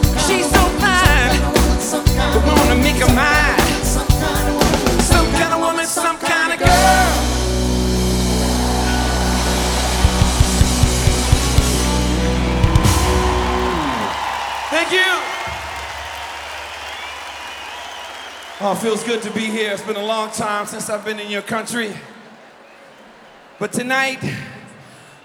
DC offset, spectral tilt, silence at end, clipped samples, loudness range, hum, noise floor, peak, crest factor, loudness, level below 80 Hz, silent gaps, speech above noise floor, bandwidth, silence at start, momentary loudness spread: under 0.1%; -4 dB/octave; 0.45 s; under 0.1%; 10 LU; none; -43 dBFS; 0 dBFS; 16 dB; -16 LUFS; -22 dBFS; none; 22 dB; over 20 kHz; 0 s; 14 LU